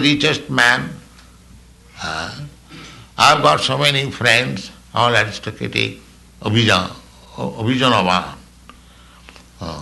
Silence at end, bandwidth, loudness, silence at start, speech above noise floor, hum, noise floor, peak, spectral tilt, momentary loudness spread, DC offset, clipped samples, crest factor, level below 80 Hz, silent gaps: 0 s; 12 kHz; -16 LUFS; 0 s; 28 dB; 60 Hz at -45 dBFS; -45 dBFS; -2 dBFS; -4 dB/octave; 19 LU; under 0.1%; under 0.1%; 18 dB; -46 dBFS; none